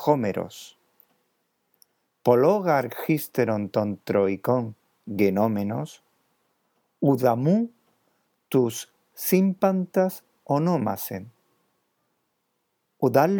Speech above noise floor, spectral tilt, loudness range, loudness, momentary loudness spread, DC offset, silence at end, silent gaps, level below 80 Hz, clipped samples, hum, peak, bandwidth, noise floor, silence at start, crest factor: 53 dB; -7 dB/octave; 3 LU; -24 LUFS; 15 LU; under 0.1%; 0 s; none; -76 dBFS; under 0.1%; none; -4 dBFS; over 20 kHz; -75 dBFS; 0 s; 22 dB